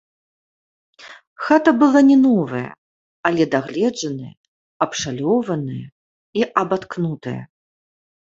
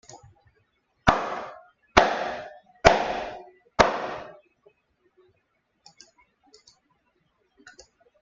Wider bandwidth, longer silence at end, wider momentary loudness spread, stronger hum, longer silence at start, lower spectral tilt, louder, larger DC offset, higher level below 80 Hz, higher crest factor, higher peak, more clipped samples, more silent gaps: about the same, 7.8 kHz vs 7.8 kHz; first, 0.8 s vs 0.5 s; second, 17 LU vs 21 LU; neither; first, 1 s vs 0.15 s; first, -6 dB/octave vs -4 dB/octave; first, -18 LUFS vs -24 LUFS; neither; second, -62 dBFS vs -46 dBFS; second, 18 dB vs 28 dB; about the same, -2 dBFS vs 0 dBFS; neither; first, 1.27-1.36 s, 2.78-3.23 s, 4.37-4.80 s, 5.92-6.33 s vs none